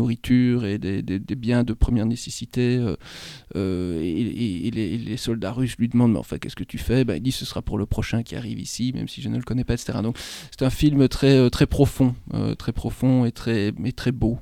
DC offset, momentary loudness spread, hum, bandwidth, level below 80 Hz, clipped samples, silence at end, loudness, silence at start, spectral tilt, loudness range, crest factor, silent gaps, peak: under 0.1%; 10 LU; none; 15.5 kHz; -36 dBFS; under 0.1%; 0 s; -23 LUFS; 0 s; -6.5 dB/octave; 6 LU; 20 dB; none; -4 dBFS